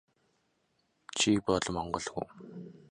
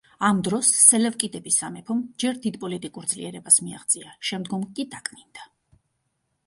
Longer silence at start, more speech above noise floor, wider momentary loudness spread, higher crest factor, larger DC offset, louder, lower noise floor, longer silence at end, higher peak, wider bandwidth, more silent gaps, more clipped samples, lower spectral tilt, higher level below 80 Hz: first, 1.15 s vs 0.2 s; second, 43 dB vs 51 dB; about the same, 20 LU vs 18 LU; about the same, 20 dB vs 24 dB; neither; second, -31 LUFS vs -21 LUFS; about the same, -75 dBFS vs -75 dBFS; second, 0.15 s vs 1 s; second, -14 dBFS vs 0 dBFS; about the same, 11 kHz vs 12 kHz; neither; neither; about the same, -3.5 dB/octave vs -2.5 dB/octave; first, -58 dBFS vs -66 dBFS